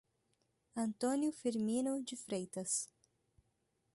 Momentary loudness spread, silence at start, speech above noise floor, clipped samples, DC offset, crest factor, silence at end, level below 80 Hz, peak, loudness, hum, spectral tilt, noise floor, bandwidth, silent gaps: 6 LU; 0.75 s; 43 dB; under 0.1%; under 0.1%; 16 dB; 1.1 s; -80 dBFS; -24 dBFS; -38 LUFS; none; -4 dB/octave; -81 dBFS; 12 kHz; none